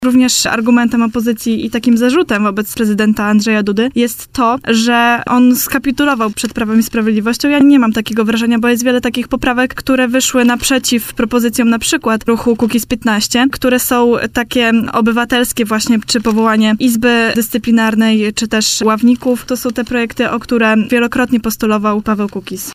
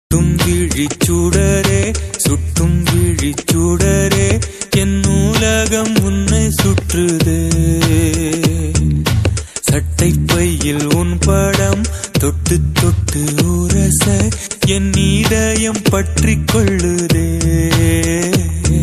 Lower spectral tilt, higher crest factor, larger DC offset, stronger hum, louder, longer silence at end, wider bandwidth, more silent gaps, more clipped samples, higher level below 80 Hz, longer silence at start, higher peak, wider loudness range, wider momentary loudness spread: second, -3.5 dB/octave vs -5 dB/octave; about the same, 10 dB vs 14 dB; neither; neither; about the same, -12 LUFS vs -14 LUFS; about the same, 0 s vs 0 s; first, 16 kHz vs 14 kHz; neither; neither; second, -40 dBFS vs -22 dBFS; about the same, 0 s vs 0.1 s; about the same, -2 dBFS vs 0 dBFS; about the same, 1 LU vs 1 LU; about the same, 5 LU vs 3 LU